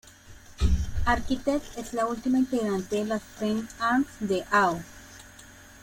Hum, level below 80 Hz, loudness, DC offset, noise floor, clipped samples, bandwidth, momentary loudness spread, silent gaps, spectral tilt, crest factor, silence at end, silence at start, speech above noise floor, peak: none; -36 dBFS; -27 LUFS; under 0.1%; -49 dBFS; under 0.1%; 16.5 kHz; 21 LU; none; -5.5 dB/octave; 18 dB; 0.05 s; 0.25 s; 23 dB; -10 dBFS